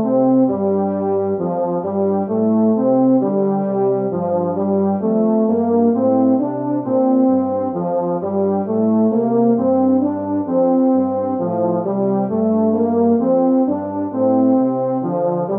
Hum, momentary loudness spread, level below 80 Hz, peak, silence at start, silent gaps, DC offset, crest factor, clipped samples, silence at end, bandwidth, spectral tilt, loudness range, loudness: none; 5 LU; -68 dBFS; -4 dBFS; 0 s; none; under 0.1%; 12 dB; under 0.1%; 0 s; 2.3 kHz; -14 dB/octave; 1 LU; -17 LUFS